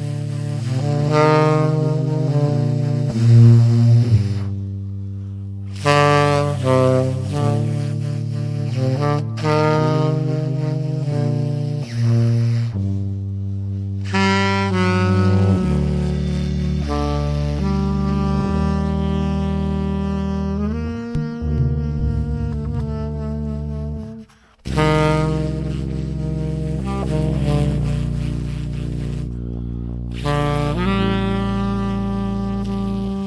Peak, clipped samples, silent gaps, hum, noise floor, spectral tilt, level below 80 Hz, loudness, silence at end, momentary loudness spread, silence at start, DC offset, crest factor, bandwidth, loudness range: -2 dBFS; under 0.1%; none; none; -41 dBFS; -7.5 dB/octave; -30 dBFS; -20 LUFS; 0 s; 10 LU; 0 s; under 0.1%; 16 dB; 11 kHz; 7 LU